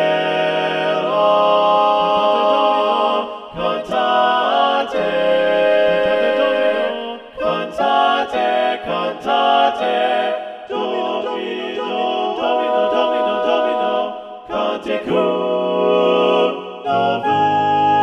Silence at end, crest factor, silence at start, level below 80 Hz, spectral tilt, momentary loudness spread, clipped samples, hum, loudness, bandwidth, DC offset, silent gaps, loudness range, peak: 0 s; 14 dB; 0 s; -56 dBFS; -5.5 dB/octave; 8 LU; under 0.1%; none; -17 LUFS; 9.4 kHz; under 0.1%; none; 3 LU; -2 dBFS